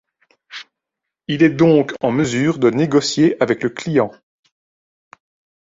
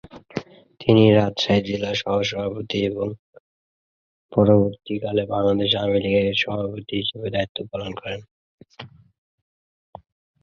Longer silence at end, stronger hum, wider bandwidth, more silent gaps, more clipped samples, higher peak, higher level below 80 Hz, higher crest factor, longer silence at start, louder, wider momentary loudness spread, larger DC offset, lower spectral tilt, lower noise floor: about the same, 1.5 s vs 1.55 s; neither; about the same, 7.8 kHz vs 7.2 kHz; second, none vs 3.19-3.33 s, 3.40-4.29 s, 7.49-7.55 s, 8.31-8.58 s; neither; about the same, -2 dBFS vs -2 dBFS; second, -56 dBFS vs -50 dBFS; about the same, 16 dB vs 20 dB; first, 0.5 s vs 0.15 s; first, -16 LUFS vs -21 LUFS; first, 21 LU vs 17 LU; neither; about the same, -6 dB/octave vs -6.5 dB/octave; second, -82 dBFS vs under -90 dBFS